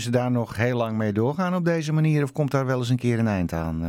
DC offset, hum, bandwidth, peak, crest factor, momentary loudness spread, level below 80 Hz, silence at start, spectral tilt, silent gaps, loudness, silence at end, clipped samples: under 0.1%; none; 16 kHz; -8 dBFS; 14 dB; 3 LU; -48 dBFS; 0 s; -7 dB/octave; none; -24 LUFS; 0 s; under 0.1%